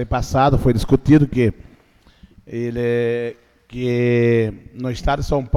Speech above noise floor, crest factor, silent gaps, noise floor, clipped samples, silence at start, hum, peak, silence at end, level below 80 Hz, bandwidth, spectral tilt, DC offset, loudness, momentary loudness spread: 35 dB; 16 dB; none; -52 dBFS; under 0.1%; 0 s; none; -2 dBFS; 0 s; -32 dBFS; 14 kHz; -7.5 dB/octave; under 0.1%; -18 LUFS; 13 LU